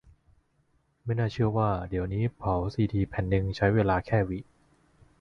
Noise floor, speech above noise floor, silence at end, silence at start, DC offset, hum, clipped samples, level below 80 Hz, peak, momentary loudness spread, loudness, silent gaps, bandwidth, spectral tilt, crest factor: -69 dBFS; 43 dB; 0.8 s; 1.05 s; under 0.1%; none; under 0.1%; -44 dBFS; -10 dBFS; 7 LU; -28 LUFS; none; 6.6 kHz; -9 dB/octave; 18 dB